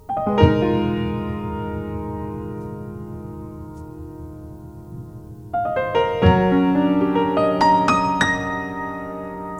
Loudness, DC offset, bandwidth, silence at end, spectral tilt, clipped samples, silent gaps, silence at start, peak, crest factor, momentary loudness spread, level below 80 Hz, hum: -20 LUFS; under 0.1%; 12 kHz; 0 s; -7 dB/octave; under 0.1%; none; 0.1 s; 0 dBFS; 20 dB; 20 LU; -38 dBFS; none